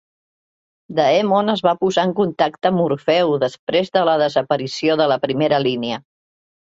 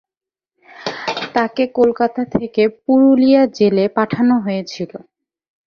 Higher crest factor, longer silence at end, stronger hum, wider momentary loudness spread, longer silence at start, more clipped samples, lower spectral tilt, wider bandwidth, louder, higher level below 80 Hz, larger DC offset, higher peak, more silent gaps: about the same, 16 dB vs 14 dB; about the same, 0.75 s vs 0.7 s; neither; second, 5 LU vs 14 LU; about the same, 0.9 s vs 0.8 s; neither; about the same, -6 dB/octave vs -6.5 dB/octave; first, 8 kHz vs 6.8 kHz; second, -18 LUFS vs -15 LUFS; about the same, -62 dBFS vs -58 dBFS; neither; about the same, -2 dBFS vs -2 dBFS; first, 3.59-3.67 s vs none